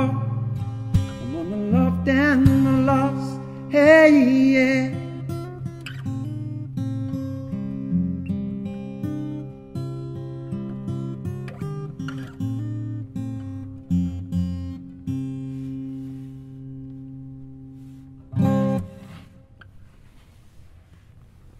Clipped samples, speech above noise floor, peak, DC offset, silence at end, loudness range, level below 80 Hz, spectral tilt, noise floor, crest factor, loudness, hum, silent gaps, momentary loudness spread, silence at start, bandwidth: under 0.1%; 35 dB; -2 dBFS; under 0.1%; 0 s; 14 LU; -46 dBFS; -8 dB/octave; -49 dBFS; 22 dB; -23 LUFS; none; none; 21 LU; 0 s; 13.5 kHz